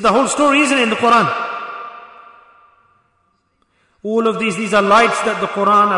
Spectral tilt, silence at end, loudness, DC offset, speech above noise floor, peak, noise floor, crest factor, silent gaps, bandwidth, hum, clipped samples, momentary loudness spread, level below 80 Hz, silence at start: -3.5 dB/octave; 0 s; -14 LUFS; under 0.1%; 49 dB; -2 dBFS; -63 dBFS; 14 dB; none; 11 kHz; none; under 0.1%; 15 LU; -54 dBFS; 0 s